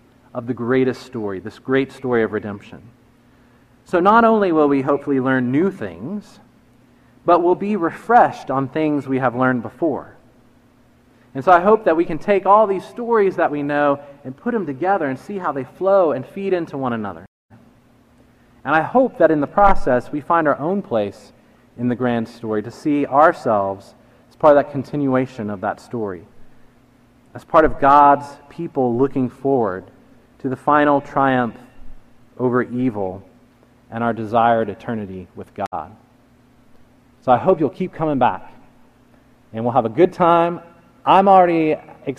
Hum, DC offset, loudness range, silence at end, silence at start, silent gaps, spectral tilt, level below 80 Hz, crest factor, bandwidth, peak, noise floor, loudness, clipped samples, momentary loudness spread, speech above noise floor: none; under 0.1%; 6 LU; 0.05 s; 0.35 s; 17.28-17.49 s, 35.67-35.71 s; -8 dB/octave; -42 dBFS; 18 dB; 11.5 kHz; 0 dBFS; -53 dBFS; -18 LUFS; under 0.1%; 14 LU; 35 dB